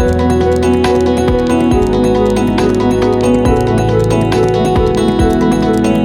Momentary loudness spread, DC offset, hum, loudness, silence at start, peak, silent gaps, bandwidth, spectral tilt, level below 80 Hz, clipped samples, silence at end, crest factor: 1 LU; under 0.1%; none; -12 LUFS; 0 s; 0 dBFS; none; 13 kHz; -7 dB/octave; -24 dBFS; under 0.1%; 0 s; 10 dB